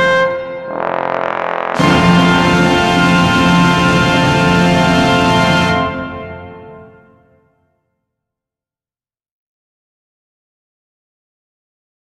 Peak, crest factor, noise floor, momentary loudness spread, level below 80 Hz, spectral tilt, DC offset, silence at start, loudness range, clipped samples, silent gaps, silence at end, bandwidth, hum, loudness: 0 dBFS; 14 dB; under -90 dBFS; 13 LU; -36 dBFS; -5.5 dB/octave; under 0.1%; 0 s; 9 LU; under 0.1%; none; 5.2 s; 12.5 kHz; none; -12 LUFS